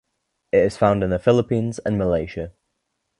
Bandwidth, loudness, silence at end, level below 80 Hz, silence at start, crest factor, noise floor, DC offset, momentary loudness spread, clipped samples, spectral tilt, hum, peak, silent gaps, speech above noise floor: 11 kHz; -20 LUFS; 0.7 s; -44 dBFS; 0.55 s; 20 dB; -75 dBFS; under 0.1%; 11 LU; under 0.1%; -7.5 dB/octave; none; -2 dBFS; none; 56 dB